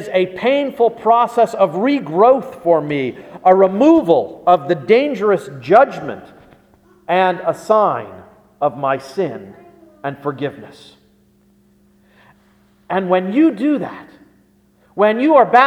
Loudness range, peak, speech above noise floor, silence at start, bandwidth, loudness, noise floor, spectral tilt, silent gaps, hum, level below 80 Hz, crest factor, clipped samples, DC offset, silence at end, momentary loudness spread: 12 LU; 0 dBFS; 40 dB; 0 s; 14 kHz; -15 LUFS; -54 dBFS; -7 dB/octave; none; 60 Hz at -55 dBFS; -60 dBFS; 16 dB; under 0.1%; under 0.1%; 0 s; 14 LU